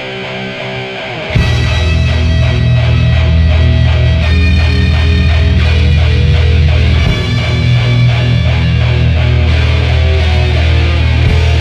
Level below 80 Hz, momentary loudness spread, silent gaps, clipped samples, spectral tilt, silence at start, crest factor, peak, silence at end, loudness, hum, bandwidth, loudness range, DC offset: -14 dBFS; 4 LU; none; under 0.1%; -6.5 dB/octave; 0 s; 8 dB; 0 dBFS; 0 s; -11 LUFS; none; 7.8 kHz; 1 LU; under 0.1%